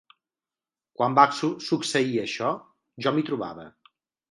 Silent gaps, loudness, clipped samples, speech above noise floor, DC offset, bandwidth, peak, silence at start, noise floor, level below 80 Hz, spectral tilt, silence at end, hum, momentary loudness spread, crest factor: none; -25 LUFS; under 0.1%; over 66 dB; under 0.1%; 11.5 kHz; -2 dBFS; 1 s; under -90 dBFS; -72 dBFS; -5 dB/octave; 0.65 s; none; 16 LU; 24 dB